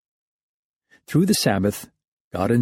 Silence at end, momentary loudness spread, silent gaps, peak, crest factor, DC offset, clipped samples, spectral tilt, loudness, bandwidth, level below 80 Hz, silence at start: 0 s; 14 LU; 2.08-2.31 s; -6 dBFS; 18 dB; under 0.1%; under 0.1%; -5 dB/octave; -21 LUFS; 16.5 kHz; -54 dBFS; 1.1 s